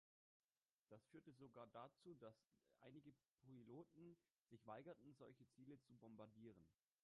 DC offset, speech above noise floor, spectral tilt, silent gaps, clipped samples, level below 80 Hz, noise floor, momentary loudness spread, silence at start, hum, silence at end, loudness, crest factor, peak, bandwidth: under 0.1%; over 25 dB; -7.5 dB/octave; 3.30-3.38 s, 4.30-4.35 s; under 0.1%; under -90 dBFS; under -90 dBFS; 7 LU; 0.9 s; none; 0.3 s; -65 LUFS; 20 dB; -46 dBFS; 8.8 kHz